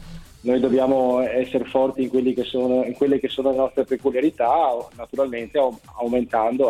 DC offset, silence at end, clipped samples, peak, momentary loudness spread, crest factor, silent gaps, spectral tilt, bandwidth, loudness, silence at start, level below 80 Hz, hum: under 0.1%; 0 s; under 0.1%; -6 dBFS; 6 LU; 16 dB; none; -6.5 dB/octave; 13 kHz; -22 LUFS; 0 s; -50 dBFS; none